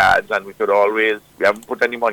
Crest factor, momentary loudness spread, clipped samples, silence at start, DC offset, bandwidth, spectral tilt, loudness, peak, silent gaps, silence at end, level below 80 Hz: 14 dB; 6 LU; under 0.1%; 0 s; under 0.1%; 18 kHz; -4 dB/octave; -18 LUFS; -2 dBFS; none; 0 s; -52 dBFS